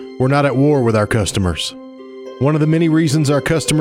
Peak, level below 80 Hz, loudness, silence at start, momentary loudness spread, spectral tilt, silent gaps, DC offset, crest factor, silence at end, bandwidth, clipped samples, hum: -2 dBFS; -40 dBFS; -15 LUFS; 0 s; 16 LU; -6 dB/octave; none; under 0.1%; 14 dB; 0 s; 15.5 kHz; under 0.1%; none